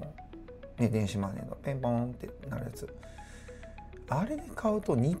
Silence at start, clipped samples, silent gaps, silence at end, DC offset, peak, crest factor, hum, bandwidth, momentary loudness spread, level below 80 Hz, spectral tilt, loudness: 0 s; under 0.1%; none; 0 s; under 0.1%; -14 dBFS; 20 dB; none; 15 kHz; 19 LU; -50 dBFS; -7.5 dB/octave; -33 LUFS